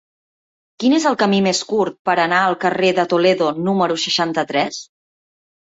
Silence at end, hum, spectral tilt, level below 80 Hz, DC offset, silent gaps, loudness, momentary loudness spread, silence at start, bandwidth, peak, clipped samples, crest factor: 0.75 s; none; -4 dB/octave; -62 dBFS; under 0.1%; 1.99-2.05 s; -17 LUFS; 5 LU; 0.8 s; 8 kHz; -4 dBFS; under 0.1%; 14 dB